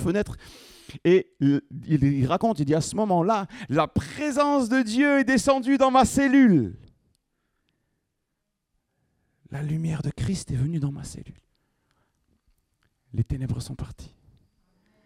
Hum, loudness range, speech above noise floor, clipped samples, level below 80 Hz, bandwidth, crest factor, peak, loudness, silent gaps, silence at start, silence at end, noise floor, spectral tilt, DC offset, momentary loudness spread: none; 15 LU; 57 dB; under 0.1%; -48 dBFS; 15 kHz; 20 dB; -6 dBFS; -23 LUFS; none; 0 s; 1 s; -79 dBFS; -6.5 dB/octave; under 0.1%; 15 LU